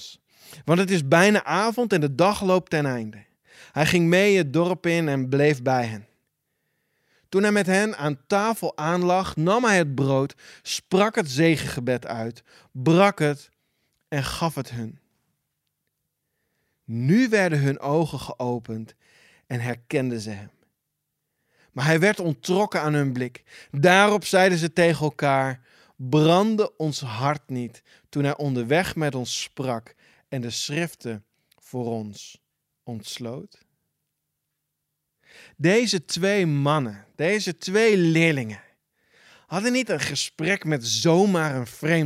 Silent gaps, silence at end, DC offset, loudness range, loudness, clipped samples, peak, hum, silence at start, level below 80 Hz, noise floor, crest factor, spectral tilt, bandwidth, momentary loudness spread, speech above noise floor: none; 0 s; under 0.1%; 11 LU; -22 LUFS; under 0.1%; -2 dBFS; none; 0 s; -60 dBFS; -80 dBFS; 22 dB; -5.5 dB/octave; 15.5 kHz; 16 LU; 57 dB